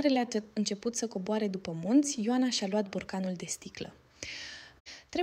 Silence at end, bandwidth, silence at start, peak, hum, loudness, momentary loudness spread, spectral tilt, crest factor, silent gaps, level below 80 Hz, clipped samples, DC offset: 0 s; 15 kHz; 0 s; -14 dBFS; none; -32 LUFS; 17 LU; -4 dB/octave; 18 dB; 4.80-4.85 s; -68 dBFS; under 0.1%; under 0.1%